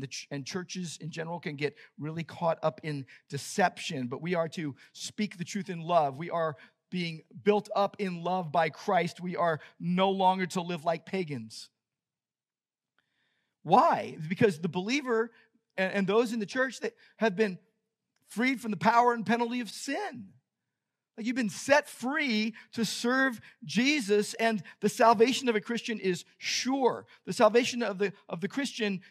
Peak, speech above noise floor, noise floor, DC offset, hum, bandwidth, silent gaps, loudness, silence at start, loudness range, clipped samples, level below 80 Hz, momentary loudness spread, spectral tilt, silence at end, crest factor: -8 dBFS; over 60 dB; under -90 dBFS; under 0.1%; none; 14.5 kHz; none; -30 LUFS; 0 s; 6 LU; under 0.1%; -86 dBFS; 13 LU; -4.5 dB/octave; 0.1 s; 22 dB